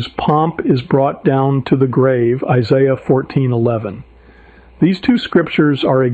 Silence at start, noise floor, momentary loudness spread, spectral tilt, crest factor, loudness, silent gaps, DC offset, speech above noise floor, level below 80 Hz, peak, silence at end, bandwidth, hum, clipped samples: 0 s; -43 dBFS; 4 LU; -9 dB/octave; 12 dB; -14 LUFS; none; under 0.1%; 29 dB; -48 dBFS; -2 dBFS; 0 s; 7.8 kHz; none; under 0.1%